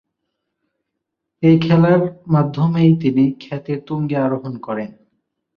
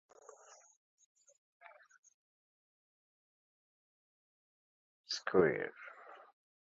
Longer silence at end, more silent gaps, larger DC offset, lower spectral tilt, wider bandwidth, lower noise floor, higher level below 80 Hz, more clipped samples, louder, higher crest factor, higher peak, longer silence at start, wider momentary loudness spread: first, 0.7 s vs 0.5 s; neither; neither; first, -10 dB/octave vs -3.5 dB/octave; second, 5.6 kHz vs 7.6 kHz; first, -78 dBFS vs -60 dBFS; first, -56 dBFS vs -76 dBFS; neither; first, -17 LUFS vs -35 LUFS; second, 16 dB vs 28 dB; first, -2 dBFS vs -16 dBFS; second, 1.4 s vs 5.1 s; second, 13 LU vs 28 LU